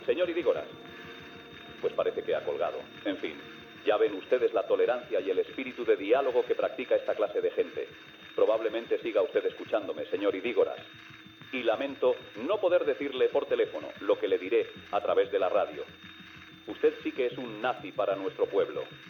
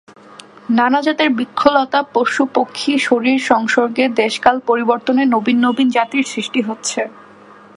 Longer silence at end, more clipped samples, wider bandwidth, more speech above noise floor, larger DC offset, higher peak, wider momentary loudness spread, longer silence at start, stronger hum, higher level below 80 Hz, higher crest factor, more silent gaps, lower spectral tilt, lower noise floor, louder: second, 0 s vs 0.65 s; neither; first, 16.5 kHz vs 11.5 kHz; second, 20 dB vs 27 dB; neither; second, -12 dBFS vs 0 dBFS; first, 17 LU vs 6 LU; second, 0 s vs 0.7 s; neither; second, -76 dBFS vs -58 dBFS; about the same, 18 dB vs 16 dB; neither; first, -6 dB/octave vs -3.5 dB/octave; first, -50 dBFS vs -42 dBFS; second, -30 LUFS vs -15 LUFS